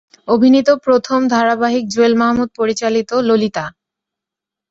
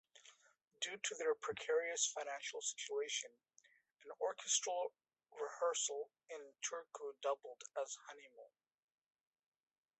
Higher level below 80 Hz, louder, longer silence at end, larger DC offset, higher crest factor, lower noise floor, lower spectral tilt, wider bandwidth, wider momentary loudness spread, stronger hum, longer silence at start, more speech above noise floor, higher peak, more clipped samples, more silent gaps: first, -54 dBFS vs under -90 dBFS; first, -14 LUFS vs -42 LUFS; second, 1 s vs 1.55 s; neither; second, 14 dB vs 22 dB; first, -85 dBFS vs -75 dBFS; first, -5 dB/octave vs 1 dB/octave; about the same, 8 kHz vs 8.4 kHz; second, 7 LU vs 17 LU; neither; about the same, 0.25 s vs 0.15 s; first, 71 dB vs 31 dB; first, -2 dBFS vs -22 dBFS; neither; neither